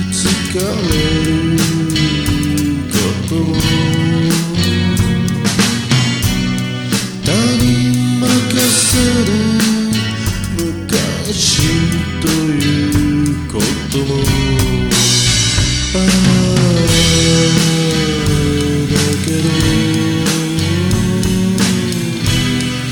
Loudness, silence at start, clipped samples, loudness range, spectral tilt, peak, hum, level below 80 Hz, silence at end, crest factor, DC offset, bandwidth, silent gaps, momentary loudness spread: -13 LUFS; 0 s; under 0.1%; 3 LU; -4.5 dB/octave; 0 dBFS; none; -28 dBFS; 0 s; 12 dB; under 0.1%; 19 kHz; none; 6 LU